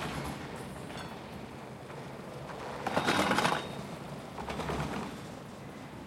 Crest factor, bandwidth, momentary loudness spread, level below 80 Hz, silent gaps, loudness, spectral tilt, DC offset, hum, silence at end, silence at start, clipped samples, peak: 24 dB; 16.5 kHz; 16 LU; -56 dBFS; none; -36 LUFS; -4.5 dB/octave; under 0.1%; none; 0 s; 0 s; under 0.1%; -12 dBFS